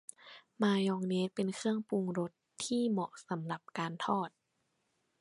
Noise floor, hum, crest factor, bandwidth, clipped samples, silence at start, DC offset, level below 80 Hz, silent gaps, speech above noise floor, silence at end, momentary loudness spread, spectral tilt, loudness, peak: -80 dBFS; none; 20 dB; 11.5 kHz; under 0.1%; 0.25 s; under 0.1%; -82 dBFS; none; 46 dB; 0.9 s; 10 LU; -5.5 dB/octave; -35 LUFS; -16 dBFS